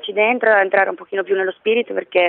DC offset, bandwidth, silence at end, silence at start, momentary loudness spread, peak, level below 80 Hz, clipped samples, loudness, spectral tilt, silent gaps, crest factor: under 0.1%; 4.3 kHz; 0 s; 0.05 s; 7 LU; -2 dBFS; -68 dBFS; under 0.1%; -17 LUFS; -8.5 dB/octave; none; 14 dB